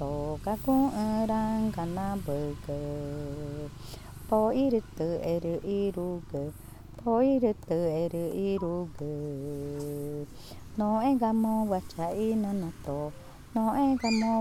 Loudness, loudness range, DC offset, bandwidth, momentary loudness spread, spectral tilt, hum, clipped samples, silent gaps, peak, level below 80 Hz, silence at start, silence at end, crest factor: -30 LUFS; 3 LU; under 0.1%; 18 kHz; 13 LU; -7.5 dB/octave; none; under 0.1%; none; -14 dBFS; -50 dBFS; 0 s; 0 s; 16 dB